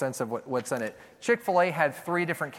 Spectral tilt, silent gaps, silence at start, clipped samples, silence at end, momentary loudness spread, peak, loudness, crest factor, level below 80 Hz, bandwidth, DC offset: -5 dB/octave; none; 0 s; under 0.1%; 0 s; 9 LU; -8 dBFS; -28 LUFS; 20 dB; -74 dBFS; 17 kHz; under 0.1%